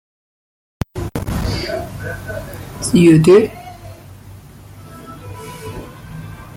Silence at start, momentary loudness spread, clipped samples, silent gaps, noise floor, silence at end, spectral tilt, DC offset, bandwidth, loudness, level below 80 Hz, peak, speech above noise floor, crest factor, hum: 0.95 s; 26 LU; under 0.1%; none; -38 dBFS; 0 s; -6.5 dB/octave; under 0.1%; 16.5 kHz; -15 LUFS; -36 dBFS; -2 dBFS; 27 dB; 18 dB; none